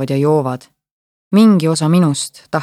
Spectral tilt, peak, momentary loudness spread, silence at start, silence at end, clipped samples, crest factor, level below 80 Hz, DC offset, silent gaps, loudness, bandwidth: -6.5 dB/octave; -2 dBFS; 11 LU; 0 s; 0 s; under 0.1%; 14 dB; -62 dBFS; under 0.1%; 0.91-1.31 s; -14 LUFS; 14 kHz